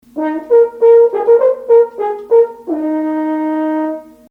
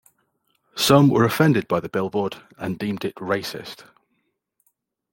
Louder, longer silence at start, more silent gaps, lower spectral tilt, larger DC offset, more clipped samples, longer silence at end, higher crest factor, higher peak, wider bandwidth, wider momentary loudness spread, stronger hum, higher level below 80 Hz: first, -13 LUFS vs -21 LUFS; second, 0.15 s vs 0.75 s; neither; first, -7 dB/octave vs -5.5 dB/octave; neither; neither; second, 0.3 s vs 1.4 s; second, 12 dB vs 20 dB; about the same, 0 dBFS vs -2 dBFS; second, 3.3 kHz vs 17 kHz; second, 11 LU vs 19 LU; neither; about the same, -60 dBFS vs -60 dBFS